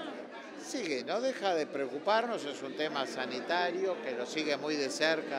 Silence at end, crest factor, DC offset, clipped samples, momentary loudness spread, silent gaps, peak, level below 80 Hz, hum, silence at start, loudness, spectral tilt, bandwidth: 0 s; 20 dB; under 0.1%; under 0.1%; 9 LU; none; -14 dBFS; -90 dBFS; none; 0 s; -33 LUFS; -3 dB/octave; 15 kHz